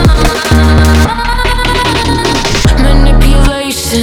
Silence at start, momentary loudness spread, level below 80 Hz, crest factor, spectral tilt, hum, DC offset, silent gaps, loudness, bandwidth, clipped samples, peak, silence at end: 0 s; 5 LU; -10 dBFS; 8 dB; -5 dB/octave; none; under 0.1%; none; -9 LUFS; 16.5 kHz; under 0.1%; 0 dBFS; 0 s